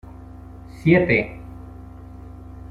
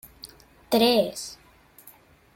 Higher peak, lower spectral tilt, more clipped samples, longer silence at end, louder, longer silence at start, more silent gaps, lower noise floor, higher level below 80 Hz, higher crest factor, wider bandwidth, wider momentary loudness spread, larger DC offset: first, -2 dBFS vs -8 dBFS; first, -8.5 dB/octave vs -3.5 dB/octave; neither; second, 0.05 s vs 1 s; first, -19 LUFS vs -23 LUFS; second, 0.05 s vs 0.25 s; neither; second, -40 dBFS vs -54 dBFS; first, -42 dBFS vs -60 dBFS; about the same, 22 dB vs 20 dB; second, 7 kHz vs 17 kHz; about the same, 25 LU vs 25 LU; neither